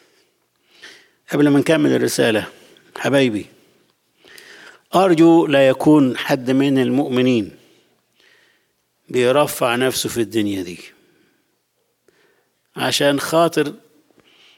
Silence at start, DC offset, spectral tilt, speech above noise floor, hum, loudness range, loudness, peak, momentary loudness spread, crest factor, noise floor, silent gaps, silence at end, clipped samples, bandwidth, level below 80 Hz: 0.85 s; under 0.1%; -5 dB/octave; 52 dB; none; 7 LU; -17 LUFS; -4 dBFS; 13 LU; 16 dB; -68 dBFS; none; 0.8 s; under 0.1%; 17 kHz; -62 dBFS